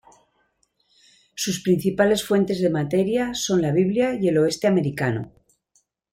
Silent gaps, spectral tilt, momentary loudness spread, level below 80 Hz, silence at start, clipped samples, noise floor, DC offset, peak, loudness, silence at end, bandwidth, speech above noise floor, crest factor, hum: none; -5.5 dB/octave; 7 LU; -56 dBFS; 1.35 s; under 0.1%; -68 dBFS; under 0.1%; -6 dBFS; -22 LUFS; 0.85 s; 16.5 kHz; 47 dB; 18 dB; none